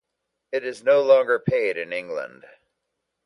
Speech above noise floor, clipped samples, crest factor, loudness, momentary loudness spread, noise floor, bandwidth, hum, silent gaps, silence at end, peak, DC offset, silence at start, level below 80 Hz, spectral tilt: 58 dB; under 0.1%; 18 dB; -22 LUFS; 15 LU; -80 dBFS; 11 kHz; none; none; 1 s; -4 dBFS; under 0.1%; 0.5 s; -62 dBFS; -6 dB/octave